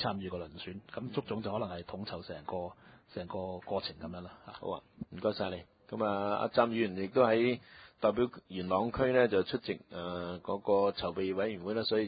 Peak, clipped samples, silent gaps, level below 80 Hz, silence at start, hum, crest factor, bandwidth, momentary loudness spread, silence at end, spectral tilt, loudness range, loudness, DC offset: -12 dBFS; under 0.1%; none; -60 dBFS; 0 s; none; 22 dB; 4.9 kHz; 15 LU; 0 s; -4 dB/octave; 9 LU; -34 LUFS; under 0.1%